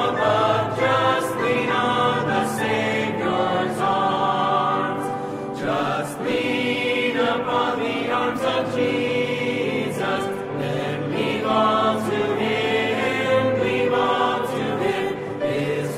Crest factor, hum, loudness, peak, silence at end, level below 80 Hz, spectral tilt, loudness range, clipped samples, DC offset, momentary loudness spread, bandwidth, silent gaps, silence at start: 16 dB; none; -22 LUFS; -6 dBFS; 0 s; -58 dBFS; -5.5 dB/octave; 2 LU; under 0.1%; under 0.1%; 6 LU; 15.5 kHz; none; 0 s